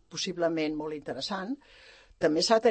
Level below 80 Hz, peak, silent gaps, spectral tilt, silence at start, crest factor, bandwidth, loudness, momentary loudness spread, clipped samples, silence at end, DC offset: -64 dBFS; -10 dBFS; none; -3.5 dB/octave; 0.1 s; 20 dB; 8.8 kHz; -30 LUFS; 12 LU; under 0.1%; 0 s; under 0.1%